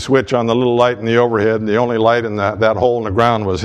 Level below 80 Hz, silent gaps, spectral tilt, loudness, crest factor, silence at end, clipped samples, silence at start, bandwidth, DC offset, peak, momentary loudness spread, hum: -44 dBFS; none; -6.5 dB/octave; -15 LUFS; 14 dB; 0 s; under 0.1%; 0 s; 9.8 kHz; under 0.1%; 0 dBFS; 2 LU; none